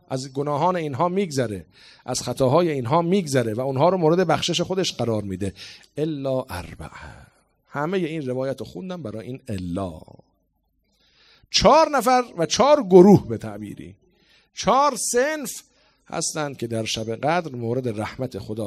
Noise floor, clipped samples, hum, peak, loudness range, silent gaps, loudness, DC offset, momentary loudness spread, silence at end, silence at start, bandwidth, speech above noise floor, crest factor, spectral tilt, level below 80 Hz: -69 dBFS; under 0.1%; none; 0 dBFS; 12 LU; none; -21 LUFS; under 0.1%; 18 LU; 0 s; 0.1 s; 15.5 kHz; 48 dB; 22 dB; -5 dB/octave; -52 dBFS